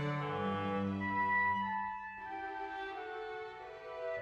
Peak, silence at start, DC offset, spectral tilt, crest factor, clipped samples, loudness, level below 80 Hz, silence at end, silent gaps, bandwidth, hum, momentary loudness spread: -24 dBFS; 0 s; under 0.1%; -7.5 dB/octave; 14 dB; under 0.1%; -37 LUFS; -70 dBFS; 0 s; none; 8.2 kHz; none; 13 LU